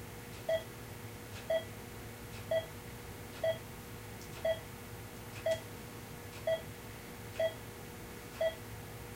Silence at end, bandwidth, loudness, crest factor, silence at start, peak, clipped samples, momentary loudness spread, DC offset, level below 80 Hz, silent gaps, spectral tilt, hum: 0 s; 16 kHz; -41 LUFS; 16 dB; 0 s; -24 dBFS; under 0.1%; 10 LU; under 0.1%; -58 dBFS; none; -4.5 dB/octave; none